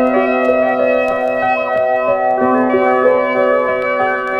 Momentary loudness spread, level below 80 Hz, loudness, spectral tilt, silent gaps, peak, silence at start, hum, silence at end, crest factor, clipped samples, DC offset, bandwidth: 3 LU; -50 dBFS; -14 LUFS; -6.5 dB/octave; none; -2 dBFS; 0 s; none; 0 s; 12 dB; under 0.1%; under 0.1%; 7.2 kHz